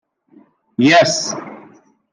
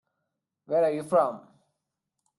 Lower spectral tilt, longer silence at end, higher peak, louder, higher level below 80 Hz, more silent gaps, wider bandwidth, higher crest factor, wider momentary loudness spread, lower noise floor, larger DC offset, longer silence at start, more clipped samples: second, -3.5 dB/octave vs -6.5 dB/octave; second, 0.55 s vs 1 s; first, -2 dBFS vs -12 dBFS; first, -14 LUFS vs -26 LUFS; first, -66 dBFS vs -76 dBFS; neither; second, 10.5 kHz vs 12 kHz; about the same, 16 dB vs 18 dB; first, 19 LU vs 8 LU; second, -51 dBFS vs -83 dBFS; neither; about the same, 0.8 s vs 0.7 s; neither